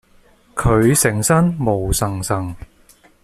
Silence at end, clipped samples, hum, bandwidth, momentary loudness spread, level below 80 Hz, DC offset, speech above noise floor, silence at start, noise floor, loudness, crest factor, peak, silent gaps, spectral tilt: 0.6 s; under 0.1%; none; 15 kHz; 14 LU; -32 dBFS; under 0.1%; 35 dB; 0.55 s; -52 dBFS; -17 LUFS; 16 dB; -2 dBFS; none; -5 dB/octave